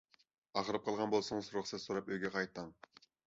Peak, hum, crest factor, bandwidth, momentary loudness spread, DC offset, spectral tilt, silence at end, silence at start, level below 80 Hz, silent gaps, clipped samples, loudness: -20 dBFS; none; 22 dB; 7.6 kHz; 7 LU; under 0.1%; -3.5 dB/octave; 0.55 s; 0.55 s; -74 dBFS; none; under 0.1%; -39 LUFS